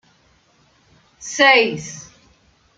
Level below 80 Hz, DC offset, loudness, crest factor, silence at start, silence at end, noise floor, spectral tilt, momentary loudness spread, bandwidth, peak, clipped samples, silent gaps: -62 dBFS; under 0.1%; -14 LUFS; 20 dB; 1.2 s; 0.75 s; -58 dBFS; -2 dB/octave; 24 LU; 9.4 kHz; -2 dBFS; under 0.1%; none